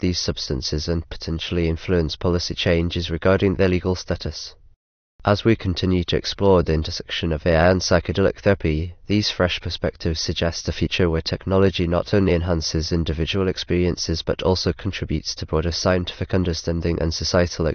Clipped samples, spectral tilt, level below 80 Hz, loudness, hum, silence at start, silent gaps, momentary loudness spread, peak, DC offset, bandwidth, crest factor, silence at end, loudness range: under 0.1%; -5.5 dB/octave; -34 dBFS; -21 LUFS; none; 0 s; 4.76-5.19 s; 7 LU; -4 dBFS; under 0.1%; 6.6 kHz; 18 dB; 0 s; 3 LU